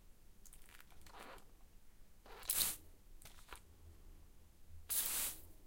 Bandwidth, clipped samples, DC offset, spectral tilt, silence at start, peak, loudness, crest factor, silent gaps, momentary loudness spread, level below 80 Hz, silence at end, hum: 16.5 kHz; under 0.1%; under 0.1%; 0 dB/octave; 0 s; -16 dBFS; -39 LUFS; 30 dB; none; 27 LU; -62 dBFS; 0 s; none